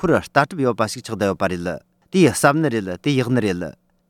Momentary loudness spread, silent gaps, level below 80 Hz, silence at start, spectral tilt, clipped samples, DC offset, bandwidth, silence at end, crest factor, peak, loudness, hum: 11 LU; none; -52 dBFS; 0 s; -5.5 dB/octave; under 0.1%; under 0.1%; 17.5 kHz; 0.4 s; 20 dB; 0 dBFS; -20 LUFS; none